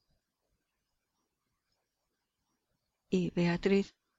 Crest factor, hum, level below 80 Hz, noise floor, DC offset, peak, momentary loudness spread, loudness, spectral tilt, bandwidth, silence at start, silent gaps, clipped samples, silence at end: 20 dB; none; -64 dBFS; -85 dBFS; under 0.1%; -18 dBFS; 5 LU; -32 LUFS; -7 dB/octave; 7.8 kHz; 3.1 s; none; under 0.1%; 0.3 s